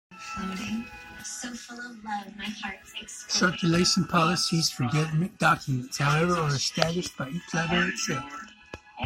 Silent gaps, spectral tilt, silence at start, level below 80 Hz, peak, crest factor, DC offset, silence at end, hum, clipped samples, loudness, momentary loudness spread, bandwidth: none; -4 dB/octave; 0.1 s; -54 dBFS; -2 dBFS; 26 dB; under 0.1%; 0 s; none; under 0.1%; -27 LUFS; 16 LU; 16 kHz